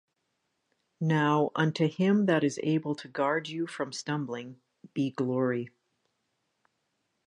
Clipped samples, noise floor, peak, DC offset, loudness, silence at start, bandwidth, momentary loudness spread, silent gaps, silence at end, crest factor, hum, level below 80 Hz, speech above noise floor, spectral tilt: under 0.1%; -79 dBFS; -12 dBFS; under 0.1%; -29 LUFS; 1 s; 10.5 kHz; 11 LU; none; 1.6 s; 18 dB; none; -78 dBFS; 51 dB; -6.5 dB/octave